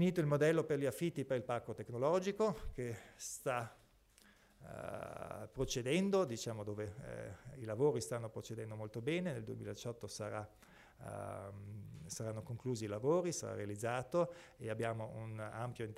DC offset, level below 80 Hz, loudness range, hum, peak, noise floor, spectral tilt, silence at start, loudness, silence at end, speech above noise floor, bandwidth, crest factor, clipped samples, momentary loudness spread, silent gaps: under 0.1%; -64 dBFS; 6 LU; none; -22 dBFS; -67 dBFS; -5.5 dB/octave; 0 s; -40 LUFS; 0 s; 28 dB; 16 kHz; 18 dB; under 0.1%; 14 LU; none